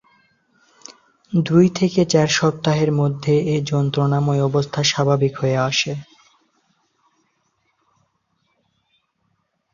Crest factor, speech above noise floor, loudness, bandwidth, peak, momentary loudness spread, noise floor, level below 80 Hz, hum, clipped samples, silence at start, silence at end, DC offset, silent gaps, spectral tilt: 18 dB; 51 dB; -18 LUFS; 7.4 kHz; -4 dBFS; 5 LU; -69 dBFS; -56 dBFS; none; under 0.1%; 0.9 s; 3.7 s; under 0.1%; none; -5.5 dB/octave